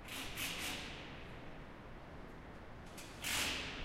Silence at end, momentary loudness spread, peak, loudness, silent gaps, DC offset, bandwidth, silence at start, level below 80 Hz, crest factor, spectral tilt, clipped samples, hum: 0 s; 17 LU; -26 dBFS; -43 LUFS; none; under 0.1%; 16 kHz; 0 s; -56 dBFS; 20 dB; -2 dB/octave; under 0.1%; none